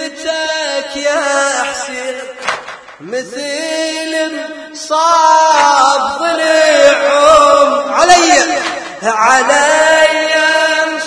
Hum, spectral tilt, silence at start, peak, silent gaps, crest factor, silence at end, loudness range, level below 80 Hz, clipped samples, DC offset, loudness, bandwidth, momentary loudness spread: none; -0.5 dB/octave; 0 s; 0 dBFS; none; 12 dB; 0 s; 9 LU; -48 dBFS; 0.5%; under 0.1%; -11 LUFS; 11 kHz; 14 LU